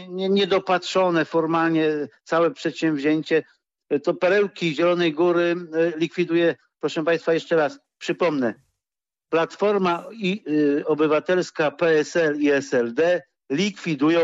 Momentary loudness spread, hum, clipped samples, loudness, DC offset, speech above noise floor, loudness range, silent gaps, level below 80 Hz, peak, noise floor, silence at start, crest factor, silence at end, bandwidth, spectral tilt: 6 LU; none; under 0.1%; -22 LUFS; under 0.1%; over 69 dB; 3 LU; none; -70 dBFS; -10 dBFS; under -90 dBFS; 0 s; 12 dB; 0 s; 8 kHz; -5.5 dB/octave